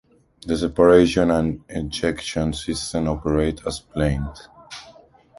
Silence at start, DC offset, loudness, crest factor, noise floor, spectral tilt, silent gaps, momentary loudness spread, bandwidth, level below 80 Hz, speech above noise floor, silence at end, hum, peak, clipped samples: 0.45 s; under 0.1%; -21 LUFS; 20 dB; -50 dBFS; -6 dB/octave; none; 21 LU; 11.5 kHz; -36 dBFS; 29 dB; 0.5 s; none; -2 dBFS; under 0.1%